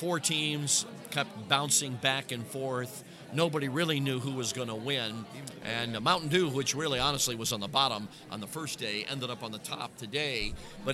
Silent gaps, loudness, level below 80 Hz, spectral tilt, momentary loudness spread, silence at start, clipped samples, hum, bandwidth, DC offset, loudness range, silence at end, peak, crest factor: none; -31 LUFS; -56 dBFS; -3 dB/octave; 11 LU; 0 s; under 0.1%; none; 16 kHz; under 0.1%; 3 LU; 0 s; -8 dBFS; 24 dB